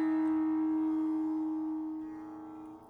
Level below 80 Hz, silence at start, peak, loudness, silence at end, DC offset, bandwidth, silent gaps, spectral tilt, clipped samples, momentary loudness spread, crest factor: -72 dBFS; 0 s; -24 dBFS; -33 LUFS; 0 s; under 0.1%; 3.4 kHz; none; -8 dB/octave; under 0.1%; 15 LU; 8 dB